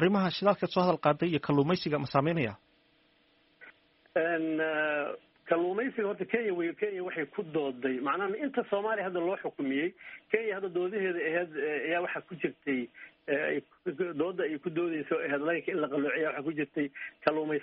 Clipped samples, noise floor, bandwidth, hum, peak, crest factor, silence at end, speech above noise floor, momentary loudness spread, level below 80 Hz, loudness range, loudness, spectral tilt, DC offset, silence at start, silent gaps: under 0.1%; -67 dBFS; 5.8 kHz; none; -10 dBFS; 22 dB; 0 s; 37 dB; 7 LU; -72 dBFS; 3 LU; -31 LUFS; -4.5 dB/octave; under 0.1%; 0 s; none